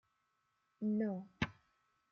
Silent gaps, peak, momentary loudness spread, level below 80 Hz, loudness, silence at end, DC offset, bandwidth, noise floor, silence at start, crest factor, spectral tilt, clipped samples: none; -22 dBFS; 6 LU; -70 dBFS; -40 LUFS; 0.6 s; under 0.1%; 6.6 kHz; -82 dBFS; 0.8 s; 20 dB; -7 dB/octave; under 0.1%